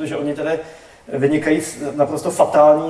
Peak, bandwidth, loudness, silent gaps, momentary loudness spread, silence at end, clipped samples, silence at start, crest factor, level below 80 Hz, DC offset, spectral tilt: 0 dBFS; 11 kHz; -18 LUFS; none; 12 LU; 0 s; under 0.1%; 0 s; 16 dB; -56 dBFS; under 0.1%; -5.5 dB/octave